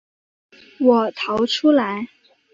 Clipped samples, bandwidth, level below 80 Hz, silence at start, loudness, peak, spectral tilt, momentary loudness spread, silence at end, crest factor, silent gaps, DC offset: under 0.1%; 7.6 kHz; -62 dBFS; 0.8 s; -19 LUFS; -4 dBFS; -5 dB/octave; 11 LU; 0.5 s; 18 dB; none; under 0.1%